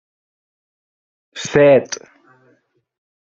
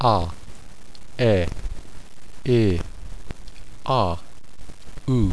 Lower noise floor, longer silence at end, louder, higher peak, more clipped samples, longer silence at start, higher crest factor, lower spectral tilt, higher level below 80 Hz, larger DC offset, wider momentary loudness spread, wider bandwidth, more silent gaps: first, -60 dBFS vs -42 dBFS; first, 1.4 s vs 0 s; first, -13 LUFS vs -23 LUFS; about the same, -2 dBFS vs -4 dBFS; neither; first, 1.35 s vs 0 s; about the same, 18 dB vs 20 dB; second, -5 dB/octave vs -7.5 dB/octave; second, -60 dBFS vs -36 dBFS; second, under 0.1% vs 4%; second, 19 LU vs 22 LU; second, 7.6 kHz vs 11 kHz; neither